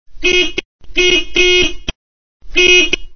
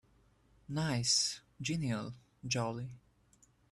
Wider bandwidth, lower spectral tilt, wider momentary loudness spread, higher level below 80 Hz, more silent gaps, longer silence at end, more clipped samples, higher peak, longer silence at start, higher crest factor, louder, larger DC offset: second, 6.6 kHz vs 13 kHz; second, -1.5 dB/octave vs -3.5 dB/octave; about the same, 15 LU vs 17 LU; first, -32 dBFS vs -66 dBFS; first, 0.65-0.79 s, 1.95-2.40 s vs none; second, 0 s vs 0.75 s; neither; first, 0 dBFS vs -18 dBFS; second, 0.05 s vs 0.7 s; second, 14 dB vs 20 dB; first, -11 LUFS vs -35 LUFS; first, 7% vs under 0.1%